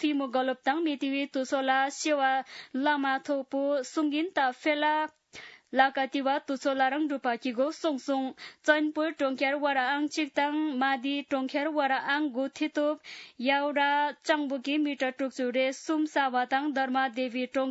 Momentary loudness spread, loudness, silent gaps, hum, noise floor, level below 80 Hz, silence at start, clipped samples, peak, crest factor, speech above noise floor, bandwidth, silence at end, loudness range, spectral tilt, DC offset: 6 LU; -29 LUFS; none; none; -50 dBFS; -84 dBFS; 0 s; under 0.1%; -8 dBFS; 22 dB; 21 dB; 8 kHz; 0 s; 1 LU; -2.5 dB/octave; under 0.1%